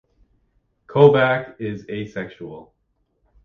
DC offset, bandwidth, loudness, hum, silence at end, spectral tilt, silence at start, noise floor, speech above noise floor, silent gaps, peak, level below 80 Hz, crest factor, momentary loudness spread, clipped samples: under 0.1%; 6.4 kHz; -19 LUFS; none; 0.8 s; -8.5 dB/octave; 0.9 s; -69 dBFS; 50 dB; none; 0 dBFS; -58 dBFS; 22 dB; 21 LU; under 0.1%